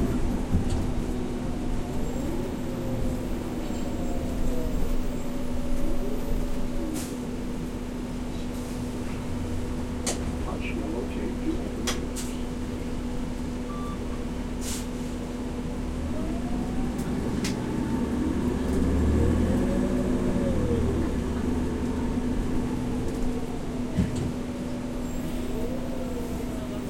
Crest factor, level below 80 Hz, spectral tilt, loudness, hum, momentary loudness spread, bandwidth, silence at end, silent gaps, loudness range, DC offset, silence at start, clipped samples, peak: 16 dB; -32 dBFS; -6.5 dB/octave; -30 LUFS; none; 7 LU; 16.5 kHz; 0 s; none; 7 LU; under 0.1%; 0 s; under 0.1%; -10 dBFS